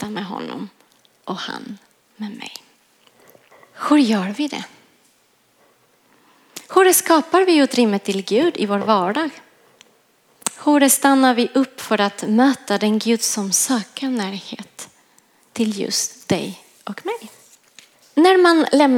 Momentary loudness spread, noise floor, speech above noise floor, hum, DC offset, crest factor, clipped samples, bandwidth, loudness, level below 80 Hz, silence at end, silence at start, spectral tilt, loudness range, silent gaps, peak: 21 LU; -59 dBFS; 42 dB; none; under 0.1%; 18 dB; under 0.1%; 17 kHz; -18 LUFS; -70 dBFS; 0 s; 0 s; -3.5 dB/octave; 9 LU; none; -2 dBFS